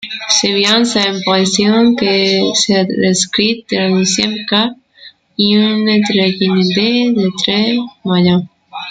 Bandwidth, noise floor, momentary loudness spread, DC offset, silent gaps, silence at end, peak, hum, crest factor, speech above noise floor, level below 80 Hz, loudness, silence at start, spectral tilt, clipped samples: 9.4 kHz; -41 dBFS; 5 LU; under 0.1%; none; 0 s; 0 dBFS; none; 14 dB; 29 dB; -54 dBFS; -12 LUFS; 0 s; -4 dB/octave; under 0.1%